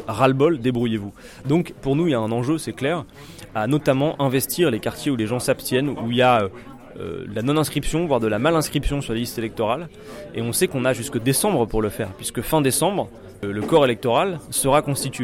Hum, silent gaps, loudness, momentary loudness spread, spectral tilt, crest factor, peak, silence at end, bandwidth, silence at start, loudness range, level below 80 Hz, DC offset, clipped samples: none; none; -21 LUFS; 12 LU; -5 dB/octave; 16 dB; -4 dBFS; 0 s; 16.5 kHz; 0 s; 2 LU; -40 dBFS; under 0.1%; under 0.1%